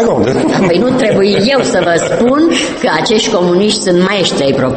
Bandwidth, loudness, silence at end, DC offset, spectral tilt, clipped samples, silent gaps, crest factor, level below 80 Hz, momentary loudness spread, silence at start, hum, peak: 8.8 kHz; -10 LUFS; 0 s; under 0.1%; -4.5 dB/octave; under 0.1%; none; 10 dB; -40 dBFS; 2 LU; 0 s; none; 0 dBFS